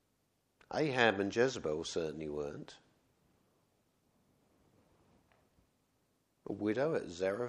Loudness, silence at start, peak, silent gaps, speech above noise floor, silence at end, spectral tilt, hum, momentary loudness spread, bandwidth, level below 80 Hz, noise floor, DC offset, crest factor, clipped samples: -35 LUFS; 0.7 s; -12 dBFS; none; 43 dB; 0 s; -5 dB/octave; none; 16 LU; 11 kHz; -70 dBFS; -78 dBFS; under 0.1%; 26 dB; under 0.1%